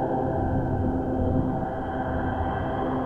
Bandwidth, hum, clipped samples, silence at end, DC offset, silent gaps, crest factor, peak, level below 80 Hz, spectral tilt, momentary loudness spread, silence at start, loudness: 4.1 kHz; none; under 0.1%; 0 s; under 0.1%; none; 16 dB; -10 dBFS; -36 dBFS; -10 dB/octave; 4 LU; 0 s; -27 LUFS